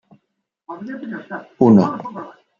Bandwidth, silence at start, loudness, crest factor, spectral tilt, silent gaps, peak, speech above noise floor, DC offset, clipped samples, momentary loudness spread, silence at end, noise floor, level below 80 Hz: 7 kHz; 0.7 s; -16 LUFS; 18 dB; -9.5 dB/octave; none; -2 dBFS; 57 dB; under 0.1%; under 0.1%; 21 LU; 0.3 s; -74 dBFS; -62 dBFS